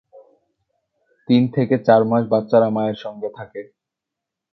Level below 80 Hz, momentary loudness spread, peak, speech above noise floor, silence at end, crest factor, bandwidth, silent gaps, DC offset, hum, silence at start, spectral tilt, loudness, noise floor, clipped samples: -64 dBFS; 17 LU; -2 dBFS; 66 dB; 0.9 s; 20 dB; 6 kHz; none; under 0.1%; none; 1.3 s; -9.5 dB/octave; -18 LUFS; -84 dBFS; under 0.1%